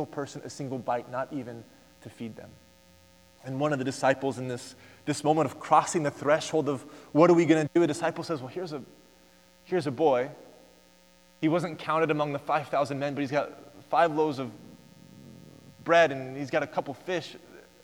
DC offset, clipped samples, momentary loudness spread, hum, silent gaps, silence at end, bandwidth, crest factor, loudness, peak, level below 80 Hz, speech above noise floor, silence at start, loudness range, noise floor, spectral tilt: under 0.1%; under 0.1%; 17 LU; none; none; 0.25 s; 16.5 kHz; 22 dB; -28 LUFS; -6 dBFS; -72 dBFS; 32 dB; 0 s; 8 LU; -59 dBFS; -5.5 dB/octave